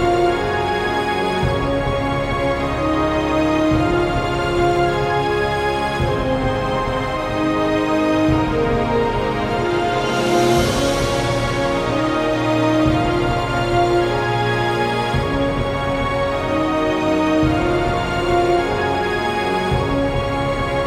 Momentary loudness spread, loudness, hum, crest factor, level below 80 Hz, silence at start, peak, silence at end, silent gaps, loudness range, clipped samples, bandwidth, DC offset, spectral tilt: 3 LU; -18 LUFS; none; 14 dB; -32 dBFS; 0 s; -4 dBFS; 0 s; none; 1 LU; under 0.1%; 16 kHz; under 0.1%; -6 dB/octave